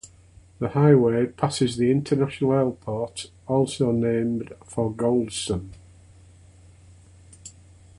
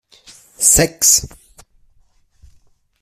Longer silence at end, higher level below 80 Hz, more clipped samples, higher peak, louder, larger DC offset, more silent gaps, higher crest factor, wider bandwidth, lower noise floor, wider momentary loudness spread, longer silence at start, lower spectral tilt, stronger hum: second, 0.5 s vs 1.75 s; second, -52 dBFS vs -38 dBFS; neither; second, -4 dBFS vs 0 dBFS; second, -23 LUFS vs -12 LUFS; neither; neither; about the same, 20 dB vs 20 dB; second, 11.5 kHz vs 16 kHz; second, -51 dBFS vs -55 dBFS; first, 16 LU vs 6 LU; second, 0.05 s vs 0.6 s; first, -6.5 dB/octave vs -1.5 dB/octave; neither